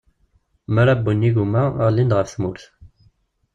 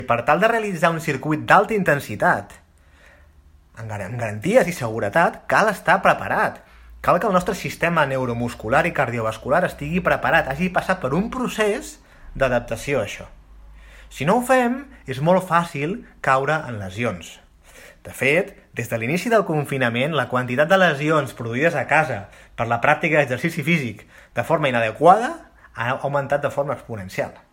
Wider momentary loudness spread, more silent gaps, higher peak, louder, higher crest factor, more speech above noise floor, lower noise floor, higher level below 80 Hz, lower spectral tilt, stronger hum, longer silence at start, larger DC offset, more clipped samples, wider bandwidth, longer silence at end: about the same, 10 LU vs 12 LU; neither; second, -4 dBFS vs 0 dBFS; about the same, -19 LUFS vs -20 LUFS; second, 16 dB vs 22 dB; first, 44 dB vs 31 dB; first, -62 dBFS vs -51 dBFS; about the same, -48 dBFS vs -48 dBFS; first, -8 dB/octave vs -5.5 dB/octave; neither; first, 0.7 s vs 0 s; neither; neither; second, 7.6 kHz vs 16.5 kHz; first, 0.9 s vs 0.15 s